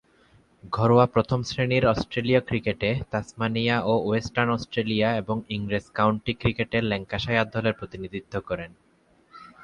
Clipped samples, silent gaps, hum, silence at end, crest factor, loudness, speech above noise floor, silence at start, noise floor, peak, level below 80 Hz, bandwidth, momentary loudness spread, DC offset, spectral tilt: under 0.1%; none; none; 0 s; 20 dB; -25 LUFS; 36 dB; 0.65 s; -60 dBFS; -4 dBFS; -48 dBFS; 9.8 kHz; 11 LU; under 0.1%; -6.5 dB/octave